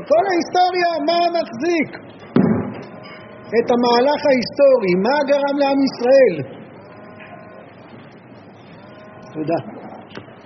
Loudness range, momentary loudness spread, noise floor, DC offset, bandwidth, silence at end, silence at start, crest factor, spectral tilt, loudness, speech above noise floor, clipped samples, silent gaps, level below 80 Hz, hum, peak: 15 LU; 23 LU; -41 dBFS; under 0.1%; 6.4 kHz; 0.1 s; 0 s; 18 dB; -4.5 dB/octave; -17 LUFS; 25 dB; under 0.1%; none; -62 dBFS; none; -2 dBFS